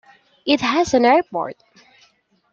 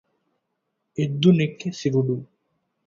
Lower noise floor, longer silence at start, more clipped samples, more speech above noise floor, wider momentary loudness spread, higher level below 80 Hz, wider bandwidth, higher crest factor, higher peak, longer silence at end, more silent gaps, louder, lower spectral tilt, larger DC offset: second, -59 dBFS vs -77 dBFS; second, 0.45 s vs 1 s; neither; second, 42 dB vs 56 dB; first, 14 LU vs 11 LU; first, -56 dBFS vs -62 dBFS; about the same, 8 kHz vs 7.4 kHz; about the same, 18 dB vs 20 dB; about the same, -2 dBFS vs -4 dBFS; first, 1 s vs 0.65 s; neither; first, -18 LUFS vs -22 LUFS; second, -4 dB/octave vs -7 dB/octave; neither